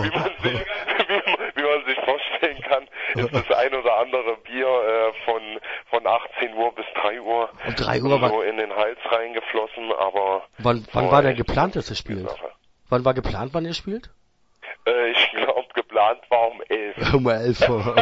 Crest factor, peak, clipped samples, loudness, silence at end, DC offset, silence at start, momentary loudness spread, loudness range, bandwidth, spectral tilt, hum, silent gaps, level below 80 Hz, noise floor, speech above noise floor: 20 dB; -2 dBFS; under 0.1%; -22 LUFS; 0 s; under 0.1%; 0 s; 8 LU; 2 LU; 8 kHz; -6 dB/octave; none; none; -44 dBFS; -48 dBFS; 26 dB